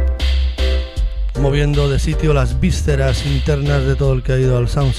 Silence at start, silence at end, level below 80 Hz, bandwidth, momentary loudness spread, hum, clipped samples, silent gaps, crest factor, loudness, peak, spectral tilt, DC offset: 0 s; 0 s; -18 dBFS; 12 kHz; 4 LU; none; under 0.1%; none; 12 dB; -17 LUFS; -2 dBFS; -6.5 dB/octave; under 0.1%